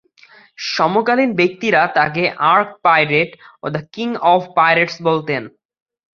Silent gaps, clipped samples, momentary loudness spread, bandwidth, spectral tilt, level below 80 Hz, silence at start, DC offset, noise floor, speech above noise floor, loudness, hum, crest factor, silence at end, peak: none; under 0.1%; 11 LU; 7.2 kHz; -5.5 dB/octave; -60 dBFS; 0.6 s; under 0.1%; -48 dBFS; 32 dB; -16 LUFS; none; 16 dB; 0.65 s; -2 dBFS